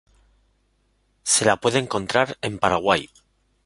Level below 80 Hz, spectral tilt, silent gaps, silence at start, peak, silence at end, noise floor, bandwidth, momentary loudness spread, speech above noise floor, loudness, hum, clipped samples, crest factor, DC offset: -54 dBFS; -3 dB/octave; none; 1.25 s; -2 dBFS; 0.6 s; -66 dBFS; 11.5 kHz; 7 LU; 44 dB; -21 LUFS; none; under 0.1%; 22 dB; under 0.1%